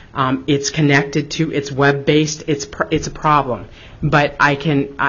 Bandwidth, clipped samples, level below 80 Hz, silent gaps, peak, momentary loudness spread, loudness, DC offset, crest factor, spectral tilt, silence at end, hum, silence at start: 7.4 kHz; under 0.1%; -40 dBFS; none; 0 dBFS; 7 LU; -17 LUFS; under 0.1%; 16 dB; -5 dB/octave; 0 s; none; 0.15 s